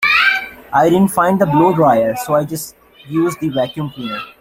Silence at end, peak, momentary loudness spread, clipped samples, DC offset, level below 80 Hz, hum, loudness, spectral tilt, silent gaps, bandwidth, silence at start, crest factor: 0.1 s; -2 dBFS; 13 LU; under 0.1%; under 0.1%; -50 dBFS; none; -15 LUFS; -5.5 dB/octave; none; 16.5 kHz; 0 s; 14 dB